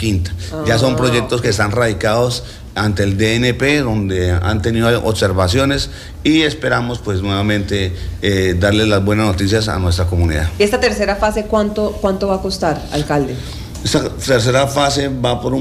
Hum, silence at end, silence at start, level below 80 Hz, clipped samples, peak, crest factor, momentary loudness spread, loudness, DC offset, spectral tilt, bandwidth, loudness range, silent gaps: none; 0 s; 0 s; -30 dBFS; under 0.1%; -2 dBFS; 12 dB; 6 LU; -16 LUFS; under 0.1%; -5.5 dB/octave; 15.5 kHz; 2 LU; none